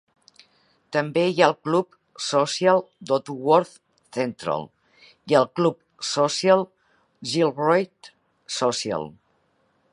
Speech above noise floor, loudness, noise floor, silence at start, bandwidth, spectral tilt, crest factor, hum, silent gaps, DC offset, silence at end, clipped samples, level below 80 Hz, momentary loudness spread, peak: 45 dB; -23 LUFS; -67 dBFS; 0.9 s; 11.5 kHz; -4.5 dB/octave; 22 dB; none; none; under 0.1%; 0.8 s; under 0.1%; -70 dBFS; 14 LU; -2 dBFS